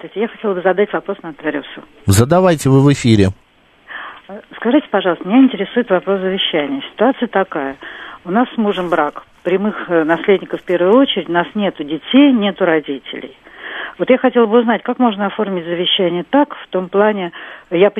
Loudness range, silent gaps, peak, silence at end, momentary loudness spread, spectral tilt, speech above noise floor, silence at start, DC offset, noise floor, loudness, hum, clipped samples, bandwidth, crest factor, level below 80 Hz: 3 LU; none; 0 dBFS; 0 s; 15 LU; -6 dB/octave; 26 dB; 0.05 s; under 0.1%; -40 dBFS; -15 LUFS; none; under 0.1%; 13.5 kHz; 16 dB; -50 dBFS